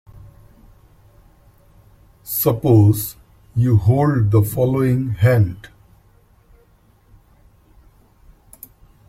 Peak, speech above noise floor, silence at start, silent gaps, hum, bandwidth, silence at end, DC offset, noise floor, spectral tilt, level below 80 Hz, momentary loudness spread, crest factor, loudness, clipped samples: -2 dBFS; 39 dB; 2.25 s; none; none; 16.5 kHz; 3.45 s; under 0.1%; -54 dBFS; -7.5 dB/octave; -46 dBFS; 12 LU; 18 dB; -17 LUFS; under 0.1%